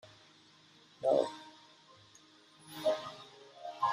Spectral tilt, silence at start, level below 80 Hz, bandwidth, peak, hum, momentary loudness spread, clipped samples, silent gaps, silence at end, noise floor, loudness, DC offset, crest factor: -4 dB/octave; 0.05 s; -82 dBFS; 15 kHz; -16 dBFS; none; 27 LU; under 0.1%; none; 0 s; -62 dBFS; -35 LUFS; under 0.1%; 22 dB